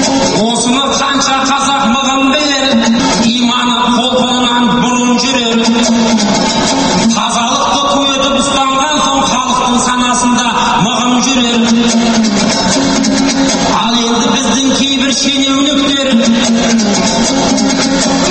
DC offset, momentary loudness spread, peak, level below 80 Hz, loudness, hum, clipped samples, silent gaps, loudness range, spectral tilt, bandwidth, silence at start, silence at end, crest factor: under 0.1%; 1 LU; 0 dBFS; -36 dBFS; -10 LUFS; none; under 0.1%; none; 0 LU; -3 dB/octave; 8.8 kHz; 0 s; 0 s; 10 dB